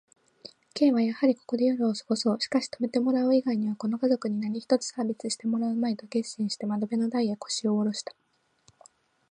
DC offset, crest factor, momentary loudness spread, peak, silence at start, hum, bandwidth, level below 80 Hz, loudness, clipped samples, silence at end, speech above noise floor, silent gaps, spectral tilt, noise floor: under 0.1%; 18 dB; 7 LU; -10 dBFS; 0.45 s; none; 10 kHz; -80 dBFS; -27 LUFS; under 0.1%; 1.3 s; 38 dB; none; -5 dB/octave; -65 dBFS